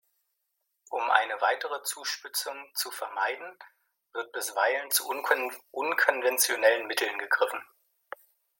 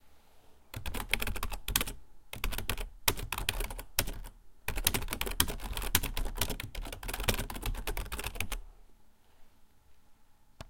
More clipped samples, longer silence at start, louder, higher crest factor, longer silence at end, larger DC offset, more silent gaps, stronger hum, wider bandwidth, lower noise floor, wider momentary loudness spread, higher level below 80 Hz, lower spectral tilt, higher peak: neither; first, 0.9 s vs 0.05 s; first, -28 LUFS vs -35 LUFS; second, 24 dB vs 30 dB; first, 0.95 s vs 0.05 s; neither; neither; neither; about the same, 17 kHz vs 17 kHz; first, -80 dBFS vs -58 dBFS; first, 15 LU vs 12 LU; second, under -90 dBFS vs -42 dBFS; second, 1 dB/octave vs -2 dB/octave; about the same, -6 dBFS vs -6 dBFS